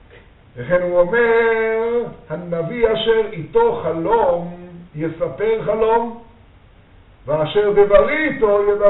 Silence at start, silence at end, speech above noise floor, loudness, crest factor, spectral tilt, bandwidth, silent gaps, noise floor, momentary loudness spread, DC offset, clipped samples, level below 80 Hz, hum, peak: 0.55 s; 0 s; 31 dB; -17 LUFS; 18 dB; -4 dB/octave; 4.1 kHz; none; -47 dBFS; 14 LU; under 0.1%; under 0.1%; -42 dBFS; none; 0 dBFS